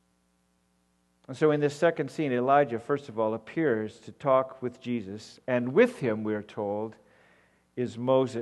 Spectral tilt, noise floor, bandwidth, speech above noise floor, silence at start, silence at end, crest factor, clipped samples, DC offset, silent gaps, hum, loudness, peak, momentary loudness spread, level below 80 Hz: -7 dB/octave; -71 dBFS; 12 kHz; 43 dB; 1.3 s; 0 s; 20 dB; under 0.1%; under 0.1%; none; 60 Hz at -60 dBFS; -28 LUFS; -10 dBFS; 12 LU; -72 dBFS